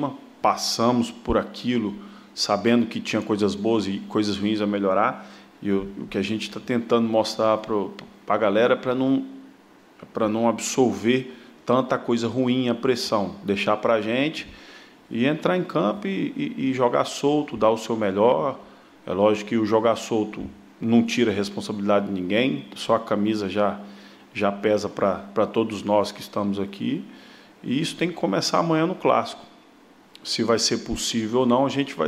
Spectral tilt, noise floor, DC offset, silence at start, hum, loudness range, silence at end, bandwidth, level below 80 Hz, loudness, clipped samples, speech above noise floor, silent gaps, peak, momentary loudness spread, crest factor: -5 dB/octave; -52 dBFS; under 0.1%; 0 s; none; 2 LU; 0 s; 15 kHz; -54 dBFS; -23 LUFS; under 0.1%; 30 dB; none; -6 dBFS; 10 LU; 18 dB